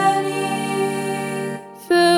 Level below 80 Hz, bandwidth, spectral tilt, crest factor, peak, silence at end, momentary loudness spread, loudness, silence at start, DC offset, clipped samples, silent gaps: -68 dBFS; 17 kHz; -4.5 dB/octave; 14 dB; -4 dBFS; 0 s; 9 LU; -22 LUFS; 0 s; under 0.1%; under 0.1%; none